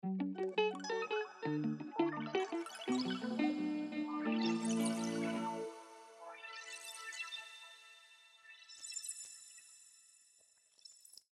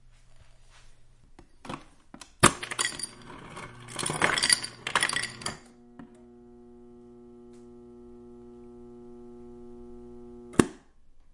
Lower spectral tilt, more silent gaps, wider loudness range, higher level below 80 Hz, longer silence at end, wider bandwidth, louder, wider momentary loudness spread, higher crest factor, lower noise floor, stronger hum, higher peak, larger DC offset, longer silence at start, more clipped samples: first, -4.5 dB/octave vs -2.5 dB/octave; neither; second, 12 LU vs 23 LU; second, under -90 dBFS vs -54 dBFS; second, 0.25 s vs 0.6 s; first, 14 kHz vs 11.5 kHz; second, -39 LUFS vs -27 LUFS; second, 21 LU vs 28 LU; second, 20 dB vs 32 dB; first, -70 dBFS vs -54 dBFS; neither; second, -20 dBFS vs -2 dBFS; neither; second, 0.05 s vs 0.35 s; neither